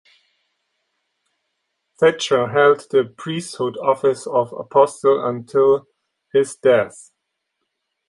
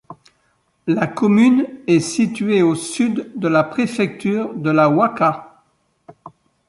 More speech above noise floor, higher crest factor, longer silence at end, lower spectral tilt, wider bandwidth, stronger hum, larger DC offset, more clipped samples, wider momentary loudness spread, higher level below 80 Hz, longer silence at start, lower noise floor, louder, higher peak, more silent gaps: first, 58 dB vs 47 dB; about the same, 18 dB vs 16 dB; first, 1.2 s vs 0.4 s; second, -4.5 dB/octave vs -6 dB/octave; about the same, 11.5 kHz vs 11.5 kHz; neither; neither; neither; about the same, 9 LU vs 8 LU; about the same, -66 dBFS vs -62 dBFS; first, 2 s vs 0.1 s; first, -76 dBFS vs -63 dBFS; about the same, -18 LUFS vs -17 LUFS; about the same, -2 dBFS vs -2 dBFS; neither